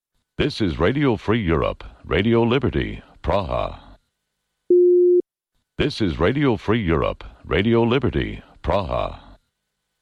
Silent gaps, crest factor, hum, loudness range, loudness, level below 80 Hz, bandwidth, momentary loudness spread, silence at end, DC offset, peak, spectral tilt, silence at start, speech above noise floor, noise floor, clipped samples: none; 14 dB; none; 3 LU; -21 LUFS; -36 dBFS; 7.2 kHz; 13 LU; 0.85 s; under 0.1%; -8 dBFS; -8 dB/octave; 0.4 s; 56 dB; -77 dBFS; under 0.1%